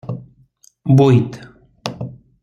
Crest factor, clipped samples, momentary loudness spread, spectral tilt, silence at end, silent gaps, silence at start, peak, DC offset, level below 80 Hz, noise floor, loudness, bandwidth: 16 dB; under 0.1%; 21 LU; -8.5 dB/octave; 0.3 s; none; 0.05 s; -2 dBFS; under 0.1%; -54 dBFS; -53 dBFS; -15 LUFS; 7.4 kHz